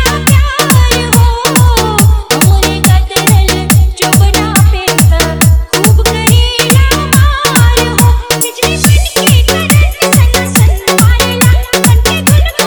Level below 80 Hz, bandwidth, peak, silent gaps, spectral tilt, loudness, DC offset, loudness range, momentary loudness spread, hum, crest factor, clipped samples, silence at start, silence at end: -12 dBFS; over 20 kHz; 0 dBFS; none; -4 dB/octave; -8 LUFS; under 0.1%; 0 LU; 1 LU; none; 8 dB; 2%; 0 s; 0 s